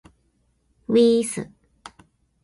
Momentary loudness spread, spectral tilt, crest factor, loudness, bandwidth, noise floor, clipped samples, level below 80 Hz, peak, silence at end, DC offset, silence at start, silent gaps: 23 LU; -5 dB/octave; 18 dB; -20 LUFS; 11.5 kHz; -66 dBFS; under 0.1%; -62 dBFS; -6 dBFS; 1 s; under 0.1%; 0.9 s; none